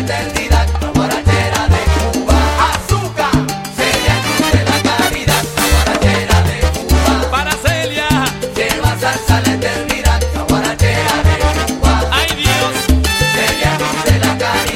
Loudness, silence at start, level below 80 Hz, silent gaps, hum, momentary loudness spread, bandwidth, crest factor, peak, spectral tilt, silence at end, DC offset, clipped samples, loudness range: -14 LUFS; 0 s; -20 dBFS; none; none; 4 LU; 16.5 kHz; 14 dB; 0 dBFS; -4.5 dB/octave; 0 s; under 0.1%; under 0.1%; 1 LU